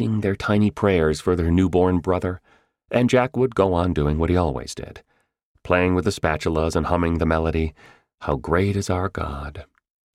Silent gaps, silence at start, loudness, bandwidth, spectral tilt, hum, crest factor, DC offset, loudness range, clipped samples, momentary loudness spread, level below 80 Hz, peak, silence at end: 5.43-5.55 s; 0 s; -21 LUFS; 13 kHz; -7 dB/octave; none; 18 dB; under 0.1%; 3 LU; under 0.1%; 11 LU; -36 dBFS; -4 dBFS; 0.5 s